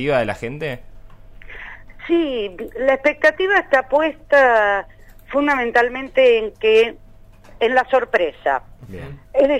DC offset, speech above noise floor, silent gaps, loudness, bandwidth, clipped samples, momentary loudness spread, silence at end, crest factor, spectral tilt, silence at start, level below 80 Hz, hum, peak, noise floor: under 0.1%; 26 dB; none; -18 LUFS; 11 kHz; under 0.1%; 20 LU; 0 s; 16 dB; -5.5 dB/octave; 0 s; -44 dBFS; none; -2 dBFS; -43 dBFS